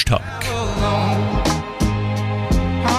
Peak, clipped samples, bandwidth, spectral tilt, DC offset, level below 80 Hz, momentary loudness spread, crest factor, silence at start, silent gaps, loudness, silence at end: -6 dBFS; under 0.1%; 15.5 kHz; -5.5 dB/octave; under 0.1%; -28 dBFS; 3 LU; 14 dB; 0 s; none; -20 LUFS; 0 s